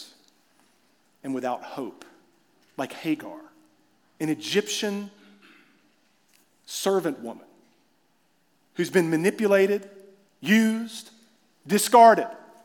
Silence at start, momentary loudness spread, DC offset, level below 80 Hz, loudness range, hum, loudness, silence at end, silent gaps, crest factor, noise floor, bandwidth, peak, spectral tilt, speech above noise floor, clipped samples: 0 s; 22 LU; under 0.1%; -88 dBFS; 13 LU; none; -23 LUFS; 0.3 s; none; 24 dB; -68 dBFS; 18 kHz; -4 dBFS; -4.5 dB/octave; 45 dB; under 0.1%